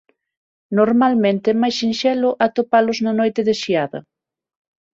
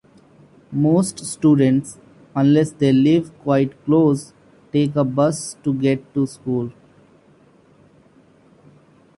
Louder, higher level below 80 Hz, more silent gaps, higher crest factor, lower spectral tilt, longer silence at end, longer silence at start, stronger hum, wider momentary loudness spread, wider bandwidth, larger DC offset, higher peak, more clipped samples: about the same, -18 LUFS vs -19 LUFS; about the same, -62 dBFS vs -58 dBFS; neither; about the same, 16 dB vs 16 dB; second, -5.5 dB/octave vs -7 dB/octave; second, 0.95 s vs 2.45 s; about the same, 0.7 s vs 0.7 s; neither; second, 6 LU vs 9 LU; second, 7.6 kHz vs 11.5 kHz; neither; about the same, -2 dBFS vs -4 dBFS; neither